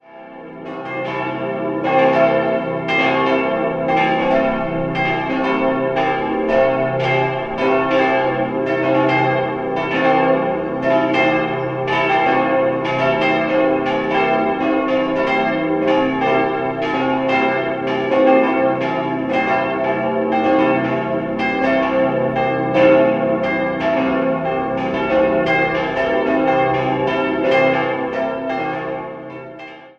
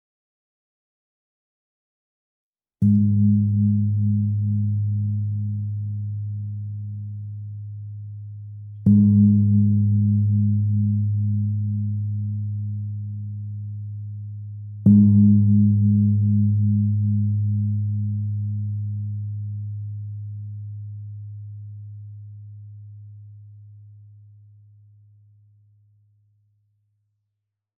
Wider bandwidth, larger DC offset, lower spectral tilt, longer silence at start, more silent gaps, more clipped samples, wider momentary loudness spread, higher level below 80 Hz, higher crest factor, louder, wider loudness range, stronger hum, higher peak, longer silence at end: first, 7 kHz vs 0.7 kHz; neither; second, -7 dB/octave vs -18 dB/octave; second, 0.1 s vs 2.8 s; neither; neither; second, 6 LU vs 21 LU; first, -48 dBFS vs -64 dBFS; about the same, 16 dB vs 18 dB; first, -17 LUFS vs -21 LUFS; second, 1 LU vs 17 LU; neither; first, 0 dBFS vs -4 dBFS; second, 0.1 s vs 3.85 s